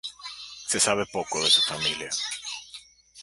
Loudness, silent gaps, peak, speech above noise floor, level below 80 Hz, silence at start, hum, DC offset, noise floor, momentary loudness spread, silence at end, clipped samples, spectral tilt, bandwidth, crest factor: -24 LUFS; none; -6 dBFS; 23 dB; -62 dBFS; 0.05 s; none; under 0.1%; -48 dBFS; 19 LU; 0 s; under 0.1%; -0.5 dB/octave; 12 kHz; 22 dB